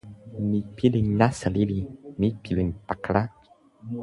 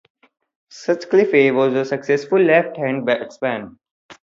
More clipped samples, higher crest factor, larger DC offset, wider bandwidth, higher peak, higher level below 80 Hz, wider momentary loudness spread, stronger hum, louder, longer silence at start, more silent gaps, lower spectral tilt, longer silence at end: neither; about the same, 22 dB vs 18 dB; neither; first, 11.5 kHz vs 7.6 kHz; about the same, -4 dBFS vs -2 dBFS; first, -44 dBFS vs -68 dBFS; first, 14 LU vs 10 LU; neither; second, -26 LUFS vs -18 LUFS; second, 0.05 s vs 0.75 s; second, none vs 3.91-4.09 s; about the same, -7.5 dB/octave vs -6.5 dB/octave; second, 0 s vs 0.2 s